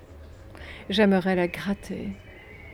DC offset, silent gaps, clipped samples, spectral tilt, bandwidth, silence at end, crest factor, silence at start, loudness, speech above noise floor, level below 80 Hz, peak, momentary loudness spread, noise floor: under 0.1%; none; under 0.1%; -6.5 dB/octave; 14.5 kHz; 0 s; 18 dB; 0 s; -25 LUFS; 21 dB; -50 dBFS; -8 dBFS; 25 LU; -45 dBFS